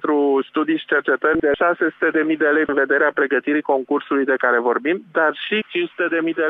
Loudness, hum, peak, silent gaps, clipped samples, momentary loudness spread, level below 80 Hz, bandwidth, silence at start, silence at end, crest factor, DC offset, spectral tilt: -19 LUFS; none; -4 dBFS; none; under 0.1%; 4 LU; -58 dBFS; 4 kHz; 0.05 s; 0 s; 14 dB; under 0.1%; -7.5 dB/octave